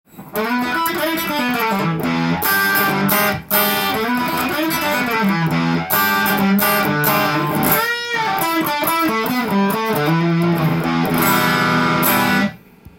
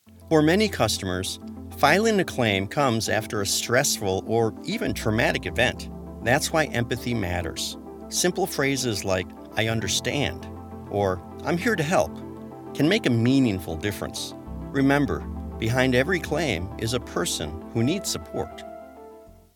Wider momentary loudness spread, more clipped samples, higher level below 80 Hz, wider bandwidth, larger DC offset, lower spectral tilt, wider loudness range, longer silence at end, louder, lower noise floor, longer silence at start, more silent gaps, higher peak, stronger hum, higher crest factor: second, 4 LU vs 13 LU; neither; about the same, -50 dBFS vs -46 dBFS; about the same, 17 kHz vs 18 kHz; neither; about the same, -4.5 dB/octave vs -4.5 dB/octave; about the same, 1 LU vs 3 LU; second, 0.1 s vs 0.25 s; first, -17 LUFS vs -24 LUFS; second, -38 dBFS vs -47 dBFS; about the same, 0.15 s vs 0.1 s; neither; first, 0 dBFS vs -4 dBFS; neither; second, 16 dB vs 22 dB